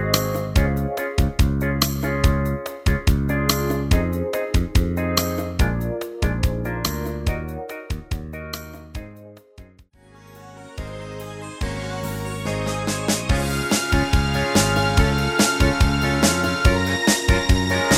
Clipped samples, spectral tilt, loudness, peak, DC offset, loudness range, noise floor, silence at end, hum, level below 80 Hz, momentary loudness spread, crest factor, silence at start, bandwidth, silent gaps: under 0.1%; -4.5 dB/octave; -21 LUFS; 0 dBFS; under 0.1%; 16 LU; -50 dBFS; 0 s; none; -26 dBFS; 14 LU; 20 dB; 0 s; 16.5 kHz; none